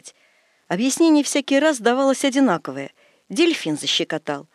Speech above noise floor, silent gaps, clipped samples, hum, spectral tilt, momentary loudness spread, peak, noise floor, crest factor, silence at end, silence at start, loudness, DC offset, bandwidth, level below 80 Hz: 41 dB; none; under 0.1%; none; -3.5 dB/octave; 12 LU; -4 dBFS; -60 dBFS; 16 dB; 0.1 s; 0.05 s; -19 LUFS; under 0.1%; 13 kHz; -82 dBFS